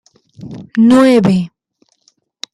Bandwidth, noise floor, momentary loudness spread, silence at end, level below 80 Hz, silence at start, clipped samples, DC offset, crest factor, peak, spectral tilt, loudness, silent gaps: 12 kHz; -59 dBFS; 23 LU; 1.05 s; -52 dBFS; 0.4 s; under 0.1%; under 0.1%; 12 dB; -2 dBFS; -7 dB/octave; -11 LUFS; none